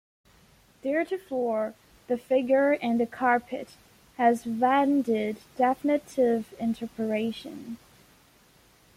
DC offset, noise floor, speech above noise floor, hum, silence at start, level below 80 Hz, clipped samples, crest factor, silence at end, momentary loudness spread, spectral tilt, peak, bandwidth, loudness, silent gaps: under 0.1%; -59 dBFS; 33 dB; none; 0.85 s; -66 dBFS; under 0.1%; 18 dB; 1.2 s; 15 LU; -6 dB/octave; -8 dBFS; 16 kHz; -27 LUFS; none